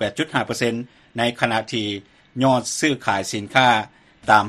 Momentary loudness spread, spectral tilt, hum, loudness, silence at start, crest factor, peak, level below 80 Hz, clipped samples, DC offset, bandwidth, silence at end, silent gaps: 14 LU; -4 dB/octave; none; -21 LUFS; 0 s; 20 dB; 0 dBFS; -58 dBFS; under 0.1%; under 0.1%; 13.5 kHz; 0 s; none